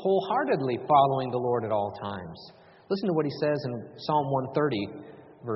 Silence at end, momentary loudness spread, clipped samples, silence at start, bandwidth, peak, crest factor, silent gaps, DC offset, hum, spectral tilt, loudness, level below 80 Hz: 0 s; 16 LU; under 0.1%; 0 s; 5.8 kHz; -8 dBFS; 20 dB; none; under 0.1%; none; -5.5 dB/octave; -27 LUFS; -66 dBFS